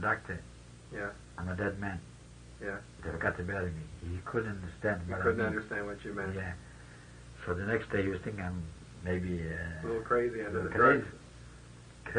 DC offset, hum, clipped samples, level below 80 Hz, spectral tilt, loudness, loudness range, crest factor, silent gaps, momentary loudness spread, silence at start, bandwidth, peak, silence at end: under 0.1%; none; under 0.1%; -54 dBFS; -7 dB/octave; -34 LUFS; 6 LU; 22 dB; none; 21 LU; 0 s; 10 kHz; -12 dBFS; 0 s